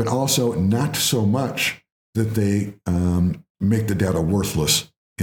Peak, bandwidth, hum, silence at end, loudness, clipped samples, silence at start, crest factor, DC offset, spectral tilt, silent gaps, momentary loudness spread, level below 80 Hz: -4 dBFS; 20 kHz; none; 0 s; -21 LUFS; under 0.1%; 0 s; 16 dB; under 0.1%; -4.5 dB/octave; 1.92-2.13 s, 3.50-3.55 s, 4.97-5.16 s; 6 LU; -46 dBFS